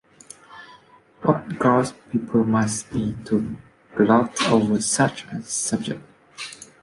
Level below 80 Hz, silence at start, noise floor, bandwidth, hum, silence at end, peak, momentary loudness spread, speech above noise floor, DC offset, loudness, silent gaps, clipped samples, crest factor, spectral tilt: -54 dBFS; 0.5 s; -52 dBFS; 11.5 kHz; none; 0.2 s; -4 dBFS; 17 LU; 30 dB; under 0.1%; -22 LUFS; none; under 0.1%; 20 dB; -5 dB/octave